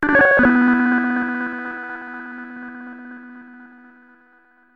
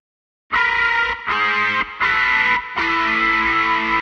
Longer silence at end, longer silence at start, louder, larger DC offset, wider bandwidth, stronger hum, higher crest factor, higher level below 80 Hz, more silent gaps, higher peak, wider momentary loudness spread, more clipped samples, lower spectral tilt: first, 1.1 s vs 0 s; second, 0 s vs 0.5 s; about the same, -17 LUFS vs -17 LUFS; neither; second, 5 kHz vs 9 kHz; neither; about the same, 16 dB vs 14 dB; about the same, -50 dBFS vs -46 dBFS; neither; about the same, -4 dBFS vs -6 dBFS; first, 24 LU vs 4 LU; neither; first, -7.5 dB/octave vs -3 dB/octave